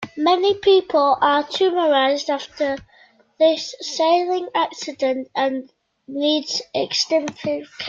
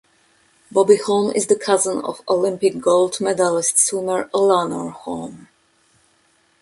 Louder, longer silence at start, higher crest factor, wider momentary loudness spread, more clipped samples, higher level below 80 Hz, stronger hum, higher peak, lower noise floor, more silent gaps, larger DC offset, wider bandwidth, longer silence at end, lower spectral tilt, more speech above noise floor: about the same, -20 LUFS vs -18 LUFS; second, 0 s vs 0.75 s; about the same, 16 dB vs 18 dB; second, 9 LU vs 13 LU; neither; about the same, -62 dBFS vs -64 dBFS; neither; second, -6 dBFS vs -2 dBFS; second, -54 dBFS vs -60 dBFS; neither; neither; second, 7.6 kHz vs 11.5 kHz; second, 0 s vs 1.15 s; about the same, -3 dB/octave vs -3.5 dB/octave; second, 34 dB vs 42 dB